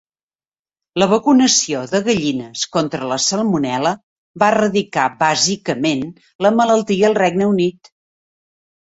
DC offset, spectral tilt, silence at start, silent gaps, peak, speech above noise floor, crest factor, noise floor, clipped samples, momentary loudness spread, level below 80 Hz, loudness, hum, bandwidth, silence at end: under 0.1%; -3.5 dB/octave; 0.95 s; 4.03-4.34 s, 6.35-6.39 s; -2 dBFS; over 74 dB; 16 dB; under -90 dBFS; under 0.1%; 8 LU; -58 dBFS; -16 LUFS; none; 8.2 kHz; 1.1 s